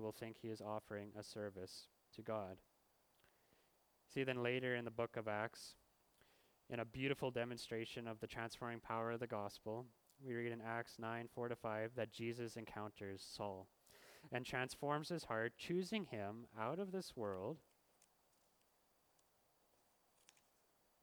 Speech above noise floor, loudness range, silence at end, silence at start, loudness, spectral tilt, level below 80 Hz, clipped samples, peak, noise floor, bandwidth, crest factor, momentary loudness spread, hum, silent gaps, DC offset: 32 dB; 6 LU; 3.4 s; 0 s; -47 LUFS; -5.5 dB/octave; -78 dBFS; under 0.1%; -26 dBFS; -79 dBFS; over 20 kHz; 22 dB; 12 LU; none; none; under 0.1%